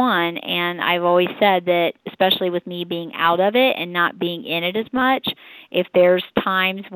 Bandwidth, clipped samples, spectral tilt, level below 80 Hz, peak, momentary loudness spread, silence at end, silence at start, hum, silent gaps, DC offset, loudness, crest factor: 19.5 kHz; under 0.1%; -8.5 dB/octave; -62 dBFS; -4 dBFS; 9 LU; 0 s; 0 s; none; none; under 0.1%; -19 LUFS; 16 dB